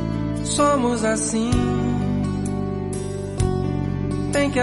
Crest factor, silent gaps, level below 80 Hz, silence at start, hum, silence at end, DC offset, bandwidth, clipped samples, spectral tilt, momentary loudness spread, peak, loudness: 14 dB; none; -34 dBFS; 0 s; none; 0 s; under 0.1%; 11.5 kHz; under 0.1%; -5.5 dB/octave; 7 LU; -6 dBFS; -22 LUFS